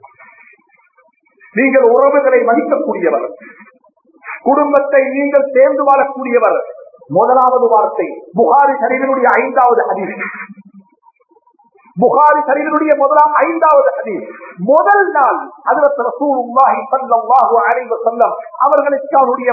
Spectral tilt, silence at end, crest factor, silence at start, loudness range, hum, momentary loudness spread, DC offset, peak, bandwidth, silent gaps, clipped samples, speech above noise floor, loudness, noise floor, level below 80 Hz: -9.5 dB/octave; 0 s; 12 dB; 1.55 s; 3 LU; none; 10 LU; under 0.1%; 0 dBFS; 2.7 kHz; none; under 0.1%; 42 dB; -12 LUFS; -54 dBFS; -68 dBFS